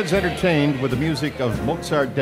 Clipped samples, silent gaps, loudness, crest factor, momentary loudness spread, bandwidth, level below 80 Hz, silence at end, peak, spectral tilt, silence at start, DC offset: under 0.1%; none; -21 LUFS; 14 dB; 5 LU; 16 kHz; -40 dBFS; 0 s; -6 dBFS; -6 dB/octave; 0 s; under 0.1%